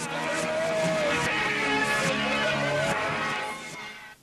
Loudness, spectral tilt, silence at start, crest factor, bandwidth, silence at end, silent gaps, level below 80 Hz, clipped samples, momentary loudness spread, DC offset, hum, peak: -26 LUFS; -3.5 dB/octave; 0 s; 14 dB; 14 kHz; 0.1 s; none; -56 dBFS; under 0.1%; 10 LU; under 0.1%; none; -14 dBFS